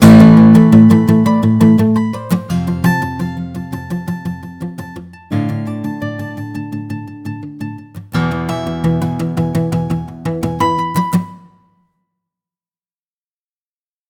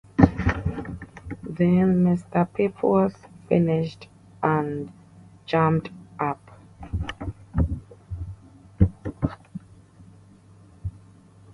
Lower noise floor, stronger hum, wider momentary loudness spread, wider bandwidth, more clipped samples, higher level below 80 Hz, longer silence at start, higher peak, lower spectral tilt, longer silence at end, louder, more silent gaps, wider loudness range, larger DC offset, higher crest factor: first, under -90 dBFS vs -51 dBFS; neither; about the same, 20 LU vs 20 LU; first, 17 kHz vs 6.6 kHz; first, 0.5% vs under 0.1%; about the same, -40 dBFS vs -38 dBFS; second, 0 s vs 0.2 s; about the same, 0 dBFS vs 0 dBFS; second, -7.5 dB/octave vs -9 dB/octave; first, 2.7 s vs 0.65 s; first, -13 LUFS vs -24 LUFS; neither; first, 12 LU vs 9 LU; neither; second, 14 dB vs 24 dB